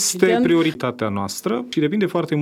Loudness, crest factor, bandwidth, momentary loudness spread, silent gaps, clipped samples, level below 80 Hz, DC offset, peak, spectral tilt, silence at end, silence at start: -20 LUFS; 16 dB; 16.5 kHz; 8 LU; none; under 0.1%; -62 dBFS; under 0.1%; -4 dBFS; -4.5 dB/octave; 0 s; 0 s